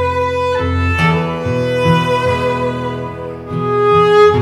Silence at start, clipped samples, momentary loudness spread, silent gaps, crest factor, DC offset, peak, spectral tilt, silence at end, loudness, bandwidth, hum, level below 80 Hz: 0 s; under 0.1%; 12 LU; none; 14 dB; under 0.1%; 0 dBFS; -6.5 dB/octave; 0 s; -14 LUFS; 12.5 kHz; none; -40 dBFS